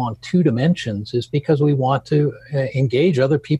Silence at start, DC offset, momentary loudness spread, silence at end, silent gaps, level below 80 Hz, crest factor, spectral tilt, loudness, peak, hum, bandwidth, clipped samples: 0 s; under 0.1%; 6 LU; 0 s; none; -54 dBFS; 14 dB; -8 dB/octave; -19 LUFS; -4 dBFS; none; 8.6 kHz; under 0.1%